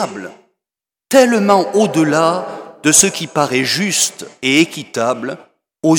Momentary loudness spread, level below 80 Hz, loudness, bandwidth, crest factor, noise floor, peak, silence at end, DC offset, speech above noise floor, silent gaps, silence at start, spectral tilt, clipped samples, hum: 13 LU; -58 dBFS; -14 LUFS; 19 kHz; 16 dB; -88 dBFS; 0 dBFS; 0 s; under 0.1%; 73 dB; none; 0 s; -3 dB/octave; under 0.1%; none